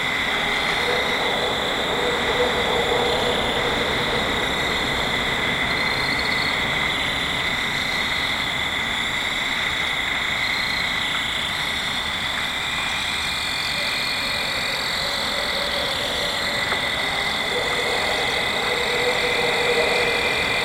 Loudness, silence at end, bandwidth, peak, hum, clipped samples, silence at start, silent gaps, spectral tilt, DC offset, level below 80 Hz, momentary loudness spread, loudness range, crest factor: -21 LUFS; 0 s; 16 kHz; -8 dBFS; none; under 0.1%; 0 s; none; -2.5 dB/octave; under 0.1%; -42 dBFS; 2 LU; 2 LU; 14 dB